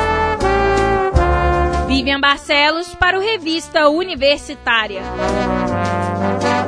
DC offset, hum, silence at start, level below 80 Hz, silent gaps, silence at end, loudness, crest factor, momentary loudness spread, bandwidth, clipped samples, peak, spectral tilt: under 0.1%; none; 0 s; -26 dBFS; none; 0 s; -16 LUFS; 16 dB; 5 LU; 11 kHz; under 0.1%; 0 dBFS; -5 dB/octave